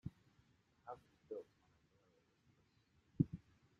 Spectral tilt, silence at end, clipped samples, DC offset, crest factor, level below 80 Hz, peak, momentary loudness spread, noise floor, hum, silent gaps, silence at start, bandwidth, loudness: -10.5 dB/octave; 0.4 s; under 0.1%; under 0.1%; 30 dB; -74 dBFS; -20 dBFS; 18 LU; -77 dBFS; none; none; 0.05 s; 7 kHz; -47 LUFS